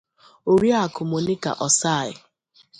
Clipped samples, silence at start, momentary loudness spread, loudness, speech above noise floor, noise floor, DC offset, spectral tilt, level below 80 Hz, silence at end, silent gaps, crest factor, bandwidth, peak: under 0.1%; 0.45 s; 8 LU; -21 LUFS; 38 dB; -59 dBFS; under 0.1%; -4 dB/octave; -58 dBFS; 0.65 s; none; 18 dB; 11 kHz; -6 dBFS